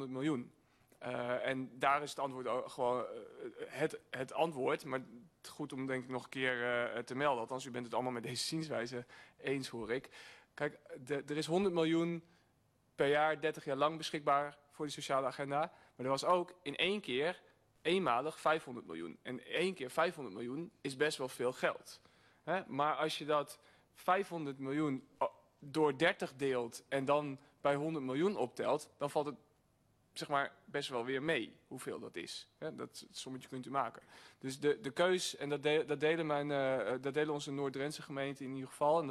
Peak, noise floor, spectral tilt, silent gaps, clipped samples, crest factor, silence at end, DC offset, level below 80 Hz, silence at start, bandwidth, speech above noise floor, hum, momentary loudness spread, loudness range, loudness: -18 dBFS; -74 dBFS; -4.5 dB/octave; none; under 0.1%; 20 dB; 0 s; under 0.1%; -78 dBFS; 0 s; 13.5 kHz; 37 dB; none; 13 LU; 5 LU; -38 LUFS